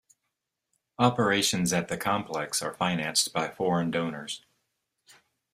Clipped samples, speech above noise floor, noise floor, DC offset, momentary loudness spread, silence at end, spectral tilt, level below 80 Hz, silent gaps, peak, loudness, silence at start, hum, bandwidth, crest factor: under 0.1%; 55 dB; -83 dBFS; under 0.1%; 8 LU; 1.15 s; -3.5 dB/octave; -64 dBFS; none; -6 dBFS; -27 LUFS; 1 s; none; 15.5 kHz; 24 dB